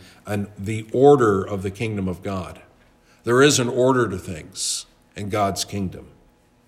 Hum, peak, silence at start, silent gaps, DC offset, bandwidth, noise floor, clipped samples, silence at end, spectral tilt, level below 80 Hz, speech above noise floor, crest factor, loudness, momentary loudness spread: none; -2 dBFS; 0.25 s; none; under 0.1%; 15.5 kHz; -56 dBFS; under 0.1%; 0.65 s; -4.5 dB/octave; -56 dBFS; 36 dB; 20 dB; -21 LUFS; 16 LU